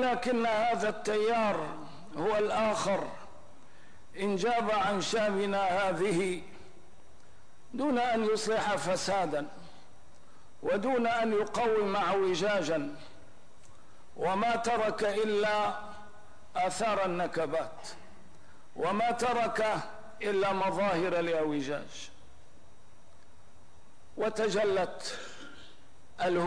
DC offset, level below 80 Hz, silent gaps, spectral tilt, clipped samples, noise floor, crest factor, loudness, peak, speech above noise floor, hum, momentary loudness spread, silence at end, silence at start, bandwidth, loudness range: 0.8%; -64 dBFS; none; -4.5 dB/octave; under 0.1%; -60 dBFS; 12 dB; -30 LUFS; -18 dBFS; 31 dB; none; 15 LU; 0 s; 0 s; 10.5 kHz; 5 LU